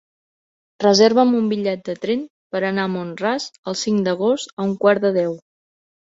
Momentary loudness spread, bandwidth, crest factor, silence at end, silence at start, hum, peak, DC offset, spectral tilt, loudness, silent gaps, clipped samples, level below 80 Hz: 12 LU; 8 kHz; 20 dB; 0.75 s; 0.8 s; none; 0 dBFS; under 0.1%; -5 dB/octave; -19 LUFS; 2.30-2.50 s, 3.58-3.63 s, 4.53-4.57 s; under 0.1%; -64 dBFS